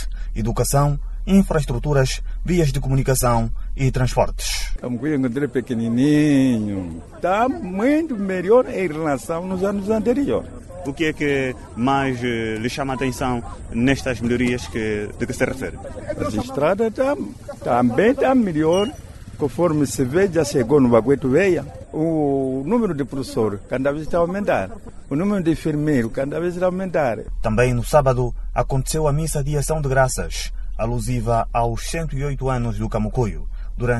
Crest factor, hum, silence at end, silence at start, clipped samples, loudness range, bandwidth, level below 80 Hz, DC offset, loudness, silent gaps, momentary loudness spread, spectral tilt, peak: 18 dB; none; 0 s; 0 s; under 0.1%; 4 LU; 12 kHz; -32 dBFS; under 0.1%; -21 LUFS; none; 10 LU; -6 dB/octave; -2 dBFS